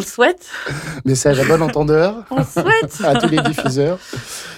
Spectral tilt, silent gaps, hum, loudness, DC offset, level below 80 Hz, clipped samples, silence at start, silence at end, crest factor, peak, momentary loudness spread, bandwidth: -5 dB/octave; none; none; -16 LUFS; under 0.1%; -44 dBFS; under 0.1%; 0 s; 0 s; 14 dB; -4 dBFS; 11 LU; 16.5 kHz